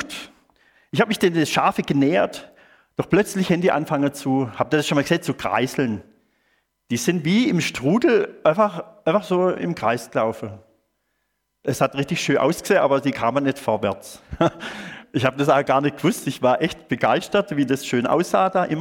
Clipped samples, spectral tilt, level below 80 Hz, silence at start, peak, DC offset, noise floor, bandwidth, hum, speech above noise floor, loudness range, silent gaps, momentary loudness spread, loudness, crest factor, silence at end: under 0.1%; -5.5 dB/octave; -54 dBFS; 0 s; -2 dBFS; under 0.1%; -74 dBFS; 17.5 kHz; none; 53 dB; 3 LU; none; 9 LU; -21 LUFS; 20 dB; 0 s